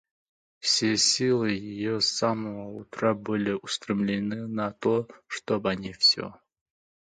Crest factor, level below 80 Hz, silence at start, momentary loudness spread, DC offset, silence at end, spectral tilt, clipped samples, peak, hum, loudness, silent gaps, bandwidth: 18 dB; -64 dBFS; 0.65 s; 12 LU; under 0.1%; 0.85 s; -3.5 dB/octave; under 0.1%; -10 dBFS; none; -26 LUFS; none; 11 kHz